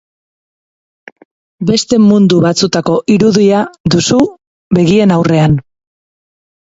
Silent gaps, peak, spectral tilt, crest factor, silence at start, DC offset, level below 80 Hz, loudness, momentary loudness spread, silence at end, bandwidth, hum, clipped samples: 3.80-3.84 s, 4.47-4.71 s; 0 dBFS; -6 dB/octave; 12 dB; 1.6 s; under 0.1%; -42 dBFS; -10 LUFS; 6 LU; 1.05 s; 8 kHz; none; under 0.1%